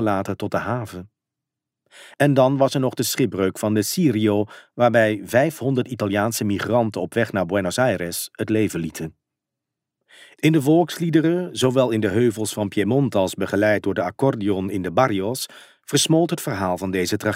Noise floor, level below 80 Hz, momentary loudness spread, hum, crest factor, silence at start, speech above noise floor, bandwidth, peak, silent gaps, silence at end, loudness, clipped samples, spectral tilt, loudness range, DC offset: -85 dBFS; -60 dBFS; 8 LU; none; 18 dB; 0 s; 64 dB; 16 kHz; -4 dBFS; none; 0 s; -21 LUFS; under 0.1%; -5.5 dB/octave; 3 LU; under 0.1%